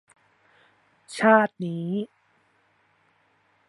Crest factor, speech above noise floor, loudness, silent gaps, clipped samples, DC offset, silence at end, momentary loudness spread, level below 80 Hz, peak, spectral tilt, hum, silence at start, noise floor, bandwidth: 24 dB; 43 dB; -23 LUFS; none; under 0.1%; under 0.1%; 1.65 s; 19 LU; -80 dBFS; -4 dBFS; -6.5 dB/octave; none; 1.1 s; -65 dBFS; 11.5 kHz